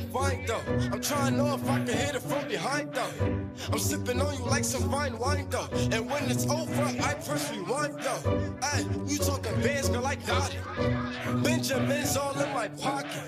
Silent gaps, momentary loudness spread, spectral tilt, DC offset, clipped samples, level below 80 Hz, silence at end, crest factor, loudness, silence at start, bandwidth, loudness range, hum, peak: none; 4 LU; -4.5 dB/octave; under 0.1%; under 0.1%; -48 dBFS; 0 s; 16 dB; -29 LUFS; 0 s; 15.5 kHz; 1 LU; none; -12 dBFS